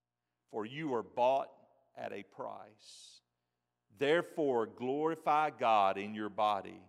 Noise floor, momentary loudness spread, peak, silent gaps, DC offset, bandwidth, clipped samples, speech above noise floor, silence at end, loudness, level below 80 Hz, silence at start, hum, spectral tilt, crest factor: -87 dBFS; 17 LU; -18 dBFS; none; under 0.1%; 13.5 kHz; under 0.1%; 53 dB; 0.1 s; -34 LUFS; -90 dBFS; 0.5 s; 60 Hz at -75 dBFS; -5.5 dB/octave; 18 dB